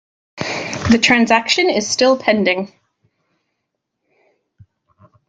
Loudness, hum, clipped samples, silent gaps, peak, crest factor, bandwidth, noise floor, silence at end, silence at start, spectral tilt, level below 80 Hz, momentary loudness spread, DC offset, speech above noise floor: -15 LUFS; none; under 0.1%; none; 0 dBFS; 18 dB; 9.2 kHz; -76 dBFS; 2.6 s; 0.35 s; -3.5 dB/octave; -50 dBFS; 12 LU; under 0.1%; 61 dB